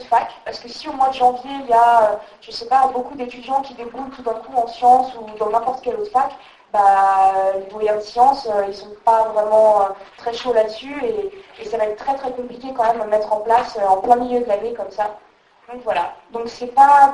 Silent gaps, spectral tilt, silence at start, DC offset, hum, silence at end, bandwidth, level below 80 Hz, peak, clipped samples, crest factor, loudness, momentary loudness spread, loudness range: none; -4 dB/octave; 0 s; under 0.1%; none; 0 s; 11 kHz; -56 dBFS; 0 dBFS; under 0.1%; 18 dB; -18 LUFS; 15 LU; 4 LU